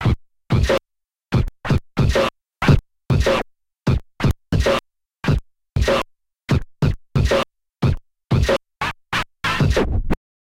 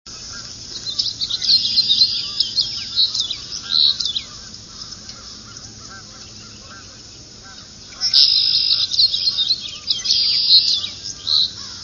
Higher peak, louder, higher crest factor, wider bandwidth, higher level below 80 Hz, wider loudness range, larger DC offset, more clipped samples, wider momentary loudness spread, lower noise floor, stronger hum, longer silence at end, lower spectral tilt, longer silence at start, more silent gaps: about the same, 0 dBFS vs 0 dBFS; second, -21 LUFS vs -15 LUFS; about the same, 20 dB vs 20 dB; first, 16 kHz vs 9.8 kHz; first, -28 dBFS vs -52 dBFS; second, 2 LU vs 18 LU; neither; neither; second, 8 LU vs 25 LU; first, -78 dBFS vs -39 dBFS; neither; first, 0.3 s vs 0 s; first, -6.5 dB/octave vs 0 dB/octave; about the same, 0 s vs 0.05 s; neither